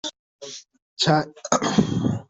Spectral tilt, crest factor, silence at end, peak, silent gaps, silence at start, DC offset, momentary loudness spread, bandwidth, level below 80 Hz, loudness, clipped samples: -4.5 dB/octave; 20 dB; 0.05 s; -4 dBFS; 0.19-0.39 s, 0.82-0.97 s; 0.05 s; under 0.1%; 18 LU; 8.2 kHz; -56 dBFS; -22 LUFS; under 0.1%